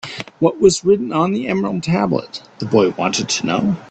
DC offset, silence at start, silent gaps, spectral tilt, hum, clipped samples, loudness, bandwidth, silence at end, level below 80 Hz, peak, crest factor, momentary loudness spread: under 0.1%; 0.05 s; none; -5 dB/octave; none; under 0.1%; -17 LUFS; 9 kHz; 0.05 s; -50 dBFS; 0 dBFS; 16 dB; 8 LU